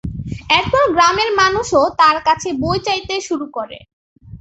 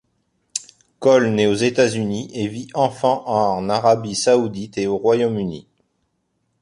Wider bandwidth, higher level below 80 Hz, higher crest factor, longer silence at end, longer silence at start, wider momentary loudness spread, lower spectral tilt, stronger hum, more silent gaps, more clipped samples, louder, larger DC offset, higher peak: second, 8.2 kHz vs 11.5 kHz; first, -40 dBFS vs -56 dBFS; about the same, 16 dB vs 18 dB; second, 0.05 s vs 1 s; second, 0.05 s vs 0.55 s; about the same, 14 LU vs 12 LU; second, -3.5 dB/octave vs -5 dB/octave; neither; first, 3.93-4.16 s vs none; neither; first, -15 LUFS vs -19 LUFS; neither; about the same, -2 dBFS vs -2 dBFS